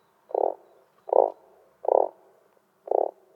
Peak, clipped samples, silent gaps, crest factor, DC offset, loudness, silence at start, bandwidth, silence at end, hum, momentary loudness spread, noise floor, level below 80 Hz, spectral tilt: -4 dBFS; under 0.1%; none; 24 dB; under 0.1%; -26 LUFS; 0.35 s; 2.6 kHz; 0.25 s; none; 10 LU; -64 dBFS; -88 dBFS; -7.5 dB/octave